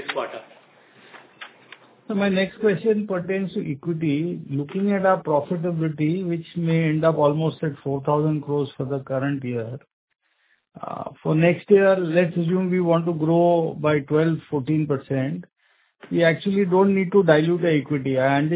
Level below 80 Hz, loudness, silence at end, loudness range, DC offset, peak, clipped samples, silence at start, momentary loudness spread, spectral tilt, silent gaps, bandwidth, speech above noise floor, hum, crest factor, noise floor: -62 dBFS; -22 LUFS; 0 s; 6 LU; under 0.1%; -2 dBFS; under 0.1%; 0 s; 11 LU; -11.5 dB/octave; 9.93-10.08 s; 4 kHz; 45 dB; none; 20 dB; -66 dBFS